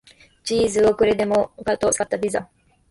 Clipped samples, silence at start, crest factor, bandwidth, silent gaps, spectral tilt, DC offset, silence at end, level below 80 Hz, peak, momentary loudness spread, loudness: under 0.1%; 0.45 s; 14 dB; 11.5 kHz; none; -4 dB/octave; under 0.1%; 0.45 s; -48 dBFS; -8 dBFS; 8 LU; -21 LUFS